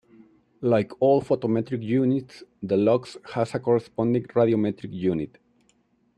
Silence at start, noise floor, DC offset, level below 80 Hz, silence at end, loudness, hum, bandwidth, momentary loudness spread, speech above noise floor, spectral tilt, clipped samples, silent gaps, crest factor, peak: 0.6 s; -65 dBFS; under 0.1%; -64 dBFS; 0.9 s; -24 LUFS; none; 10 kHz; 8 LU; 42 dB; -8.5 dB/octave; under 0.1%; none; 16 dB; -8 dBFS